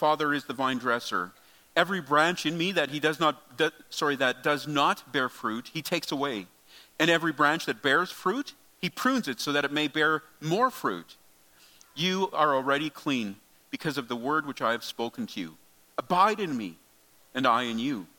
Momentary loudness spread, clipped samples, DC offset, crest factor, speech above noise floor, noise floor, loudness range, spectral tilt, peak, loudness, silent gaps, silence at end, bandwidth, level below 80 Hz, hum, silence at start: 11 LU; under 0.1%; under 0.1%; 22 dB; 33 dB; -61 dBFS; 3 LU; -4 dB/octave; -6 dBFS; -28 LUFS; none; 0.1 s; 17.5 kHz; -76 dBFS; none; 0 s